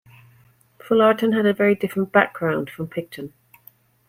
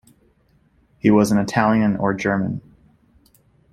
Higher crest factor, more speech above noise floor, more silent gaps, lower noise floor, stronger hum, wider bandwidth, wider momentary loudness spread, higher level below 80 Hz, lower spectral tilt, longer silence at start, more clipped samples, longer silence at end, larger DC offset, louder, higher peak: about the same, 20 dB vs 20 dB; second, 36 dB vs 42 dB; neither; about the same, -56 dBFS vs -59 dBFS; neither; first, 16.5 kHz vs 13.5 kHz; first, 16 LU vs 8 LU; second, -64 dBFS vs -52 dBFS; about the same, -7 dB/octave vs -6.5 dB/octave; second, 0.85 s vs 1.05 s; neither; second, 0.8 s vs 1.15 s; neither; about the same, -20 LUFS vs -19 LUFS; about the same, -2 dBFS vs -2 dBFS